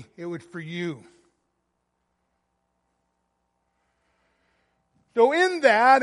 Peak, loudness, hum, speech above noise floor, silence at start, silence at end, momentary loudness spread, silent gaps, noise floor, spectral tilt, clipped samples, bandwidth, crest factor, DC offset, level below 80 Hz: -4 dBFS; -21 LUFS; none; 55 dB; 0 s; 0 s; 18 LU; none; -76 dBFS; -4.5 dB/octave; under 0.1%; 11.5 kHz; 22 dB; under 0.1%; -78 dBFS